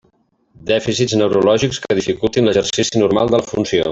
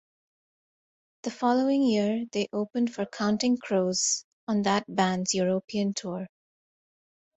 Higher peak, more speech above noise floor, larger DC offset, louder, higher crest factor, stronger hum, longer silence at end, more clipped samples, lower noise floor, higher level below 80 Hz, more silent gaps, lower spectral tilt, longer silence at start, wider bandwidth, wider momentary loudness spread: first, -2 dBFS vs -10 dBFS; second, 44 dB vs over 63 dB; neither; first, -16 LUFS vs -27 LUFS; second, 14 dB vs 20 dB; neither; second, 0 s vs 1.1 s; neither; second, -60 dBFS vs under -90 dBFS; first, -46 dBFS vs -70 dBFS; second, none vs 4.24-4.47 s, 5.64-5.68 s; about the same, -4.5 dB/octave vs -4 dB/octave; second, 0.6 s vs 1.25 s; about the same, 8 kHz vs 8.4 kHz; second, 5 LU vs 9 LU